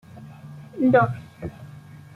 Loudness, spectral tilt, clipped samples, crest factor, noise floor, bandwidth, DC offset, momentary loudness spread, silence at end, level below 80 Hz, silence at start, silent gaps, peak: -20 LUFS; -9 dB/octave; under 0.1%; 20 dB; -43 dBFS; 6.8 kHz; under 0.1%; 25 LU; 0.15 s; -56 dBFS; 0.15 s; none; -6 dBFS